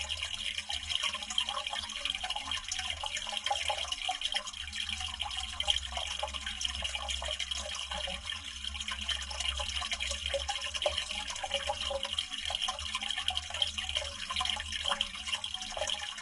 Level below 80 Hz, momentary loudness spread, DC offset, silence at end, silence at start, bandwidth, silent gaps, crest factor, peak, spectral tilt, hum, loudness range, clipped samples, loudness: -50 dBFS; 4 LU; under 0.1%; 0 s; 0 s; 11.5 kHz; none; 24 dB; -12 dBFS; -0.5 dB/octave; none; 2 LU; under 0.1%; -34 LUFS